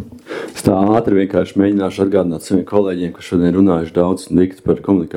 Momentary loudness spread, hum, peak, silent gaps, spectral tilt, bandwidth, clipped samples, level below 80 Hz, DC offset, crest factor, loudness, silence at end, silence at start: 6 LU; none; 0 dBFS; none; -7.5 dB/octave; 15 kHz; under 0.1%; -46 dBFS; under 0.1%; 16 dB; -15 LUFS; 0 s; 0 s